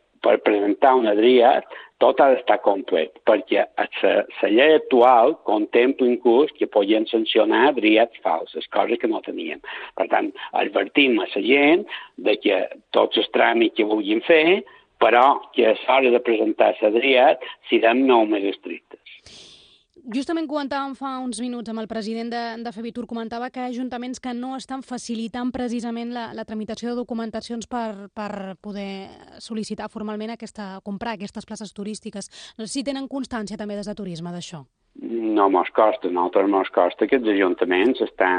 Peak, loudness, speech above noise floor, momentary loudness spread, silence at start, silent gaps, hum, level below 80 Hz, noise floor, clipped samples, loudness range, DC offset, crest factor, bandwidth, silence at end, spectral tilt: -2 dBFS; -20 LUFS; 32 dB; 16 LU; 0.25 s; none; none; -62 dBFS; -53 dBFS; under 0.1%; 13 LU; under 0.1%; 18 dB; 10 kHz; 0 s; -4.5 dB/octave